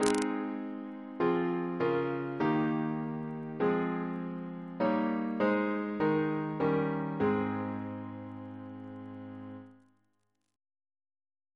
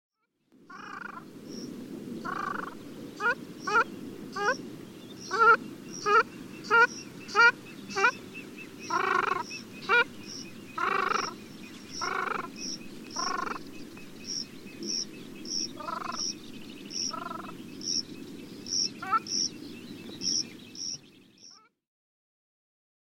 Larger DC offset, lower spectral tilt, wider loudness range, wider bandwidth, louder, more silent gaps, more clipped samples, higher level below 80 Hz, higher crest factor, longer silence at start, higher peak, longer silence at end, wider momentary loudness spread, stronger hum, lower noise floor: neither; first, -6.5 dB/octave vs -1.5 dB/octave; first, 13 LU vs 9 LU; second, 11 kHz vs 16.5 kHz; second, -32 LUFS vs -29 LUFS; neither; neither; about the same, -70 dBFS vs -70 dBFS; about the same, 26 dB vs 22 dB; second, 0 s vs 0.6 s; about the same, -8 dBFS vs -10 dBFS; first, 1.8 s vs 1.45 s; second, 15 LU vs 20 LU; neither; first, -80 dBFS vs -66 dBFS